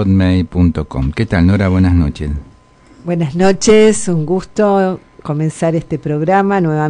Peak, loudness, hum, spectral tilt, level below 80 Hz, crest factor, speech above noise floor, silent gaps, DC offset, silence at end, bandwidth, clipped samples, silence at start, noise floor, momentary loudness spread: 0 dBFS; -14 LUFS; none; -6.5 dB/octave; -30 dBFS; 12 dB; 32 dB; none; under 0.1%; 0 s; 10.5 kHz; under 0.1%; 0 s; -44 dBFS; 11 LU